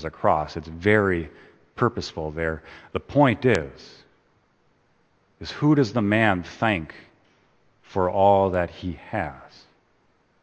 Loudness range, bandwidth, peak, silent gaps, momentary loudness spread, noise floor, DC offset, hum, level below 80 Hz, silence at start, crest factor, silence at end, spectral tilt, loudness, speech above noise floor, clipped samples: 3 LU; 8.8 kHz; -4 dBFS; none; 15 LU; -64 dBFS; under 0.1%; none; -50 dBFS; 0 s; 22 dB; 0.95 s; -7 dB/octave; -23 LUFS; 41 dB; under 0.1%